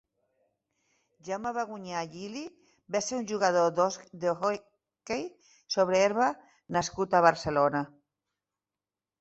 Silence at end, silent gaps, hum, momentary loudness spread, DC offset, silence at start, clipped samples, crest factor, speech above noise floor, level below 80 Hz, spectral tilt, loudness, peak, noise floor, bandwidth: 1.35 s; none; none; 15 LU; under 0.1%; 1.25 s; under 0.1%; 24 dB; over 62 dB; -66 dBFS; -4 dB/octave; -29 LUFS; -6 dBFS; under -90 dBFS; 8.2 kHz